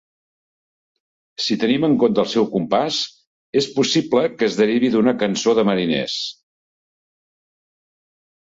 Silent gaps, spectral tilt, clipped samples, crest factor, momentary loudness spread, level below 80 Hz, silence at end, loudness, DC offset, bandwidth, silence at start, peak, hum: 3.27-3.53 s; -4.5 dB/octave; under 0.1%; 18 dB; 8 LU; -60 dBFS; 2.2 s; -19 LUFS; under 0.1%; 8 kHz; 1.4 s; -4 dBFS; none